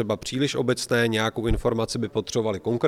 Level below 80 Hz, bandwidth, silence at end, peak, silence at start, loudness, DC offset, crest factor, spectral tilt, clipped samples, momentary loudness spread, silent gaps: -38 dBFS; 15.5 kHz; 0 s; -8 dBFS; 0 s; -25 LUFS; under 0.1%; 16 dB; -5 dB/octave; under 0.1%; 4 LU; none